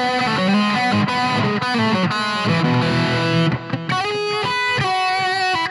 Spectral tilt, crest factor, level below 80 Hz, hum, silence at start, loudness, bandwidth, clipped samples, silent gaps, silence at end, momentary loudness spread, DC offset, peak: -5.5 dB/octave; 12 dB; -52 dBFS; none; 0 s; -18 LUFS; 11.5 kHz; under 0.1%; none; 0 s; 4 LU; under 0.1%; -6 dBFS